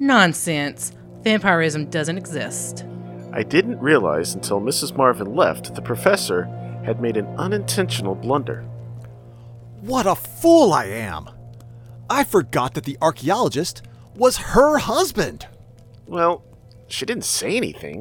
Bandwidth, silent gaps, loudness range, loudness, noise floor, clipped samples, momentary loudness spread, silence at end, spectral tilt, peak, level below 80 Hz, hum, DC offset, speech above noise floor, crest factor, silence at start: over 20 kHz; none; 4 LU; -20 LUFS; -45 dBFS; under 0.1%; 14 LU; 0 s; -4.5 dB/octave; 0 dBFS; -46 dBFS; none; under 0.1%; 25 dB; 20 dB; 0 s